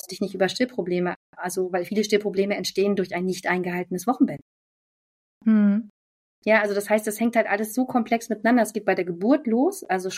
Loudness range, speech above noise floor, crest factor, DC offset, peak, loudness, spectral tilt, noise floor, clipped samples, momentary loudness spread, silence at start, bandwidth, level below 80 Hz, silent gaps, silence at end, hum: 3 LU; over 67 dB; 18 dB; under 0.1%; -6 dBFS; -24 LUFS; -5 dB/octave; under -90 dBFS; under 0.1%; 7 LU; 0.05 s; 16 kHz; -70 dBFS; 1.16-1.33 s, 4.42-5.41 s, 5.90-6.42 s; 0 s; none